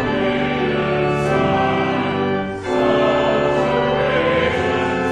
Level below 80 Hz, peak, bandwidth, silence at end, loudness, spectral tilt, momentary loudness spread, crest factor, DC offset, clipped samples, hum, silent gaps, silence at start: -40 dBFS; -4 dBFS; 10.5 kHz; 0 s; -18 LUFS; -6.5 dB/octave; 3 LU; 12 dB; under 0.1%; under 0.1%; none; none; 0 s